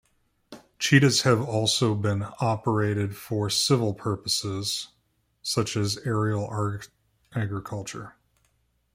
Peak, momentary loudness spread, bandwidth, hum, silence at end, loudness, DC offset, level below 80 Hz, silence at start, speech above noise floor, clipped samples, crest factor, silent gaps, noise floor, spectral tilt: -6 dBFS; 14 LU; 16 kHz; none; 0.85 s; -25 LUFS; under 0.1%; -60 dBFS; 0.5 s; 45 dB; under 0.1%; 22 dB; none; -70 dBFS; -4.5 dB/octave